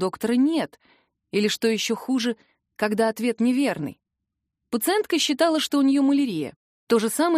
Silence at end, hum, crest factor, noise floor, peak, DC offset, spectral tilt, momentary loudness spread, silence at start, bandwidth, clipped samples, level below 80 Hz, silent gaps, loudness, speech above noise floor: 0 s; none; 16 dB; -82 dBFS; -8 dBFS; under 0.1%; -4 dB/octave; 11 LU; 0 s; 15.5 kHz; under 0.1%; -70 dBFS; 6.56-6.87 s; -23 LUFS; 60 dB